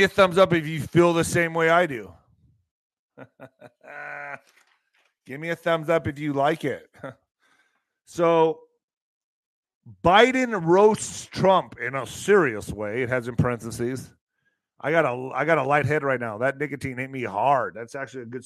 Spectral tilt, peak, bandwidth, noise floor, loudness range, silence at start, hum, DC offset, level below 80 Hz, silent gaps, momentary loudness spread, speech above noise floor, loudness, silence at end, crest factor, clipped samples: -5.5 dB/octave; -2 dBFS; 13 kHz; -74 dBFS; 9 LU; 0 s; none; under 0.1%; -56 dBFS; 2.71-3.09 s, 8.83-8.88 s, 8.97-9.63 s, 9.75-9.81 s, 14.21-14.27 s; 18 LU; 52 dB; -22 LUFS; 0.05 s; 22 dB; under 0.1%